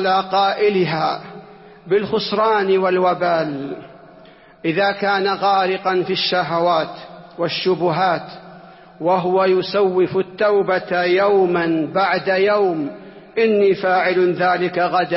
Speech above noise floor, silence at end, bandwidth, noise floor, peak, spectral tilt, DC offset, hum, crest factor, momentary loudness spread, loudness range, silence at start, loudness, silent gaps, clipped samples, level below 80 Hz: 28 dB; 0 s; 5.8 kHz; -45 dBFS; -6 dBFS; -9 dB/octave; under 0.1%; none; 12 dB; 10 LU; 3 LU; 0 s; -18 LUFS; none; under 0.1%; -62 dBFS